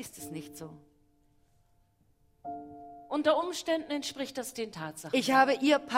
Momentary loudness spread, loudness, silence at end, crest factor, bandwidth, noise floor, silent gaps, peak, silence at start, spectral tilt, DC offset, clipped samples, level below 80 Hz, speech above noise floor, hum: 22 LU; -30 LUFS; 0 s; 24 dB; 16 kHz; -68 dBFS; none; -8 dBFS; 0 s; -3.5 dB/octave; under 0.1%; under 0.1%; -70 dBFS; 38 dB; none